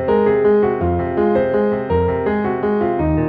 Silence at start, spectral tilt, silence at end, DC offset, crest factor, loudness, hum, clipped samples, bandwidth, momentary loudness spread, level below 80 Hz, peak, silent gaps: 0 s; -11 dB/octave; 0 s; under 0.1%; 12 dB; -17 LUFS; none; under 0.1%; 4.8 kHz; 5 LU; -34 dBFS; -4 dBFS; none